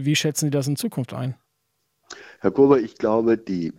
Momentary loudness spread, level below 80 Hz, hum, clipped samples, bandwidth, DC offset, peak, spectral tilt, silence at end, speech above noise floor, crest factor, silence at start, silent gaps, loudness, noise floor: 17 LU; -60 dBFS; none; under 0.1%; 17 kHz; under 0.1%; -4 dBFS; -5.5 dB/octave; 0.1 s; 52 dB; 18 dB; 0 s; none; -22 LUFS; -73 dBFS